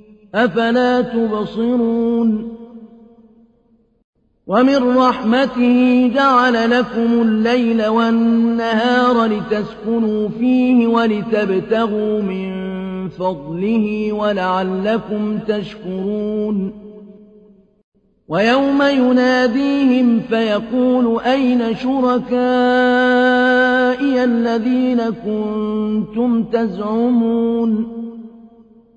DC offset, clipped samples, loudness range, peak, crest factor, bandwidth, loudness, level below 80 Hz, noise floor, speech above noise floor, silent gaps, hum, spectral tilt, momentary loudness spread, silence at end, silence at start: under 0.1%; under 0.1%; 6 LU; -4 dBFS; 12 dB; 7.4 kHz; -16 LUFS; -52 dBFS; -56 dBFS; 41 dB; 4.04-4.13 s, 17.84-17.92 s; none; -6.5 dB/octave; 9 LU; 0.5 s; 0.35 s